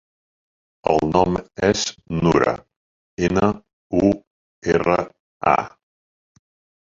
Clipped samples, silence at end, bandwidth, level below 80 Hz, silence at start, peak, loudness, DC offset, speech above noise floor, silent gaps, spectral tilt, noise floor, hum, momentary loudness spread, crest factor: under 0.1%; 1.2 s; 7.8 kHz; -44 dBFS; 0.85 s; -2 dBFS; -20 LUFS; under 0.1%; over 71 dB; 2.76-3.17 s, 3.73-3.90 s, 4.27-4.62 s, 5.20-5.40 s; -5.5 dB/octave; under -90 dBFS; none; 12 LU; 20 dB